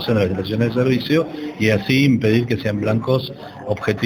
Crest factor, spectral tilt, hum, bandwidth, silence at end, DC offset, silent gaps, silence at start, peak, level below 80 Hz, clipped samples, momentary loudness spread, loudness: 16 dB; -7 dB/octave; none; over 20 kHz; 0 s; under 0.1%; none; 0 s; -2 dBFS; -50 dBFS; under 0.1%; 9 LU; -19 LUFS